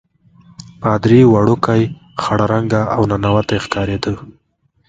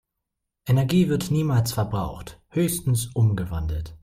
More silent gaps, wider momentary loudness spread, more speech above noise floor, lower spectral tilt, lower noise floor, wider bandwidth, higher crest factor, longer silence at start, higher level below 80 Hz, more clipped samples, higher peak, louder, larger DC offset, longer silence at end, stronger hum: neither; about the same, 12 LU vs 10 LU; second, 34 dB vs 59 dB; about the same, -7.5 dB/octave vs -6.5 dB/octave; second, -47 dBFS vs -82 dBFS; second, 7.8 kHz vs 16 kHz; about the same, 16 dB vs 14 dB; first, 0.8 s vs 0.65 s; about the same, -40 dBFS vs -42 dBFS; neither; first, 0 dBFS vs -10 dBFS; first, -15 LUFS vs -24 LUFS; neither; first, 0.6 s vs 0.05 s; neither